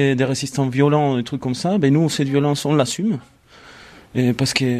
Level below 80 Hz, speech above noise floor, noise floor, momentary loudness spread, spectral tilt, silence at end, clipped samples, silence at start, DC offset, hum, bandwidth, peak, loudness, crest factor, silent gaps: -54 dBFS; 27 dB; -45 dBFS; 7 LU; -5.5 dB/octave; 0 s; under 0.1%; 0 s; under 0.1%; none; 14 kHz; -2 dBFS; -19 LUFS; 18 dB; none